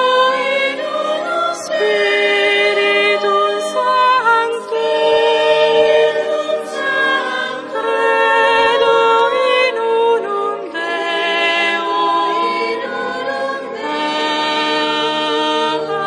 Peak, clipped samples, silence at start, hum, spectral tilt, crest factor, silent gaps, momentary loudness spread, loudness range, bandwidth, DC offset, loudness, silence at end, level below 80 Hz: -2 dBFS; under 0.1%; 0 s; none; -2.5 dB/octave; 12 dB; none; 8 LU; 4 LU; 11 kHz; under 0.1%; -15 LUFS; 0 s; -64 dBFS